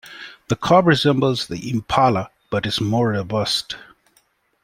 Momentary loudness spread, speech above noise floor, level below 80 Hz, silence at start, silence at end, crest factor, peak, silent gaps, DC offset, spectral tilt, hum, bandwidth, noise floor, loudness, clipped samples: 13 LU; 43 dB; -50 dBFS; 0.05 s; 0.85 s; 18 dB; -2 dBFS; none; under 0.1%; -5.5 dB/octave; none; 16 kHz; -62 dBFS; -19 LUFS; under 0.1%